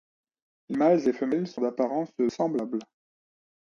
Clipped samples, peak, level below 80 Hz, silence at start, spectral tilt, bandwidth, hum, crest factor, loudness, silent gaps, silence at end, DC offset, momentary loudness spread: under 0.1%; -10 dBFS; -74 dBFS; 0.7 s; -7.5 dB/octave; 7.2 kHz; none; 18 dB; -27 LUFS; none; 0.85 s; under 0.1%; 11 LU